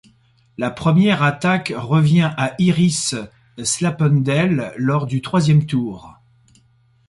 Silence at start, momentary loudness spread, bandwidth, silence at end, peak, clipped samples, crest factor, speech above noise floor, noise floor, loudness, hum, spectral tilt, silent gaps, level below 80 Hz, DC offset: 0.6 s; 11 LU; 11.5 kHz; 0.95 s; -4 dBFS; under 0.1%; 14 dB; 39 dB; -56 dBFS; -18 LUFS; none; -5.5 dB/octave; none; -52 dBFS; under 0.1%